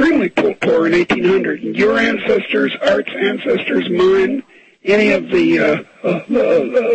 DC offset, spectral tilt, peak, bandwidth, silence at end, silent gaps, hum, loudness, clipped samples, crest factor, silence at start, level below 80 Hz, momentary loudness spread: under 0.1%; -6 dB/octave; -2 dBFS; 8.6 kHz; 0 s; none; none; -15 LUFS; under 0.1%; 12 dB; 0 s; -50 dBFS; 6 LU